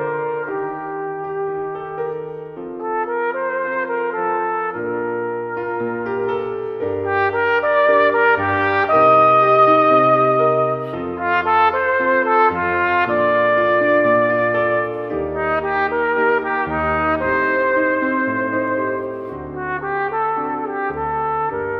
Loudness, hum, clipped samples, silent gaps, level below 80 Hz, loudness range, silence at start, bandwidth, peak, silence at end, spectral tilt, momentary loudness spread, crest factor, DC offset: -18 LUFS; none; under 0.1%; none; -48 dBFS; 9 LU; 0 s; 5.8 kHz; -2 dBFS; 0 s; -8 dB/octave; 12 LU; 16 dB; under 0.1%